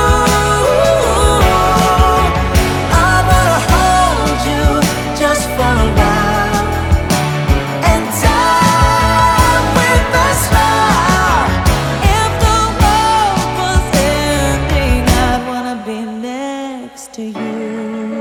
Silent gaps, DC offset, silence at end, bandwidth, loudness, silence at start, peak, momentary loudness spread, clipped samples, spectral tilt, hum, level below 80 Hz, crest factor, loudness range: none; under 0.1%; 0 s; 20 kHz; -12 LUFS; 0 s; 0 dBFS; 11 LU; under 0.1%; -4.5 dB/octave; none; -20 dBFS; 12 dB; 4 LU